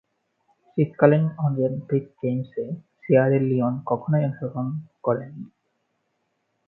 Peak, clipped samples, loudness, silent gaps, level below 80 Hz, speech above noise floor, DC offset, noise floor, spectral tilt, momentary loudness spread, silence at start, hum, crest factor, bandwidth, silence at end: 0 dBFS; under 0.1%; -23 LUFS; none; -66 dBFS; 51 dB; under 0.1%; -74 dBFS; -12.5 dB/octave; 14 LU; 0.75 s; none; 24 dB; 4 kHz; 1.2 s